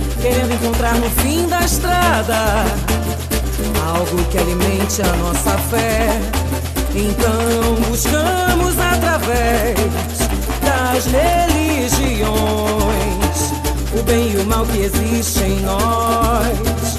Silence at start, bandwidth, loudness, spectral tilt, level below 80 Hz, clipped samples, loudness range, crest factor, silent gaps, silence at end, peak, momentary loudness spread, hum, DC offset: 0 s; 15 kHz; -16 LUFS; -4.5 dB/octave; -22 dBFS; under 0.1%; 1 LU; 16 dB; none; 0 s; 0 dBFS; 4 LU; none; under 0.1%